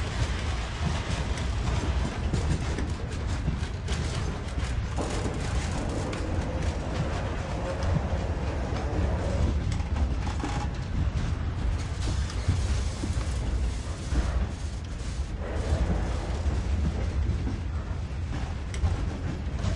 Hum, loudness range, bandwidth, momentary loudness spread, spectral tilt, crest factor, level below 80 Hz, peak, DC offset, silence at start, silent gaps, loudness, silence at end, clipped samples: none; 1 LU; 11 kHz; 5 LU; -6 dB/octave; 14 dB; -32 dBFS; -14 dBFS; under 0.1%; 0 s; none; -31 LUFS; 0 s; under 0.1%